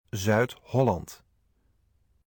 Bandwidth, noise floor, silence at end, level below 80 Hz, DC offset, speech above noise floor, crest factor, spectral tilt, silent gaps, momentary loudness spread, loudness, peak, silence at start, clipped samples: 19.5 kHz; -68 dBFS; 1.1 s; -56 dBFS; under 0.1%; 42 dB; 18 dB; -6 dB/octave; none; 9 LU; -27 LUFS; -12 dBFS; 0.15 s; under 0.1%